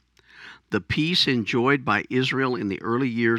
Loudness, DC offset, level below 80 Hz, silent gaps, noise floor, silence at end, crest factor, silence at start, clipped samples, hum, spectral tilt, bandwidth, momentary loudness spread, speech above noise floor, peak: -23 LUFS; under 0.1%; -56 dBFS; none; -48 dBFS; 0 s; 18 dB; 0.35 s; under 0.1%; none; -5.5 dB/octave; 13.5 kHz; 7 LU; 25 dB; -6 dBFS